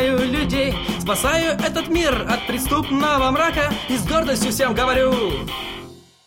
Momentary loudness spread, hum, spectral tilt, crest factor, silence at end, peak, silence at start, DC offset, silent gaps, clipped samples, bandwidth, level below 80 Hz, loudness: 6 LU; none; -4 dB/octave; 16 dB; 0.3 s; -4 dBFS; 0 s; under 0.1%; none; under 0.1%; 16.5 kHz; -34 dBFS; -20 LUFS